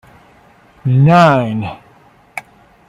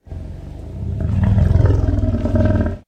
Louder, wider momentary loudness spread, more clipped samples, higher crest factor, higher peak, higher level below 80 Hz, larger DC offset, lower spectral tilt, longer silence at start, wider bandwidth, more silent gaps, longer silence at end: first, -12 LUFS vs -17 LUFS; first, 22 LU vs 18 LU; neither; about the same, 16 dB vs 14 dB; about the same, 0 dBFS vs -2 dBFS; second, -50 dBFS vs -24 dBFS; neither; second, -8 dB/octave vs -10 dB/octave; first, 0.85 s vs 0.1 s; first, 11.5 kHz vs 6.4 kHz; neither; first, 0.5 s vs 0.1 s